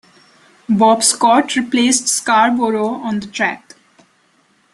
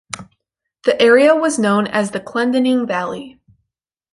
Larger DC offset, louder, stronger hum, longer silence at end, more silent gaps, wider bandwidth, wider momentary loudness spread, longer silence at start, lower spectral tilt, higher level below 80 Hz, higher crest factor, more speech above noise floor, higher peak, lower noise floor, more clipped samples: neither; about the same, -14 LUFS vs -15 LUFS; neither; first, 1.15 s vs 0.85 s; neither; first, 13 kHz vs 11.5 kHz; second, 9 LU vs 16 LU; first, 0.7 s vs 0.15 s; second, -2.5 dB/octave vs -4.5 dB/octave; about the same, -60 dBFS vs -60 dBFS; about the same, 16 dB vs 16 dB; second, 42 dB vs 63 dB; about the same, 0 dBFS vs -2 dBFS; second, -57 dBFS vs -78 dBFS; neither